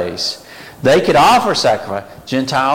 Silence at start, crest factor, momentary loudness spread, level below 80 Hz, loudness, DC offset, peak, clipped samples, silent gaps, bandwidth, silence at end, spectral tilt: 0 s; 12 dB; 15 LU; -46 dBFS; -14 LUFS; under 0.1%; -2 dBFS; under 0.1%; none; 17 kHz; 0 s; -4 dB/octave